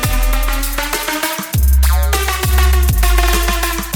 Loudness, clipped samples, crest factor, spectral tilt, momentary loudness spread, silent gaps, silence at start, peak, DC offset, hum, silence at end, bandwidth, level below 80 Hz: -15 LUFS; under 0.1%; 12 dB; -3.5 dB/octave; 5 LU; none; 0 s; 0 dBFS; under 0.1%; none; 0 s; 17.5 kHz; -14 dBFS